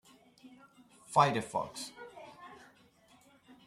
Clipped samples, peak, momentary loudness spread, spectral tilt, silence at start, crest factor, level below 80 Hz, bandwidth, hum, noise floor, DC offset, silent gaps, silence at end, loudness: under 0.1%; -10 dBFS; 25 LU; -4.5 dB/octave; 0.45 s; 26 dB; -74 dBFS; 14 kHz; none; -64 dBFS; under 0.1%; none; 1.1 s; -32 LUFS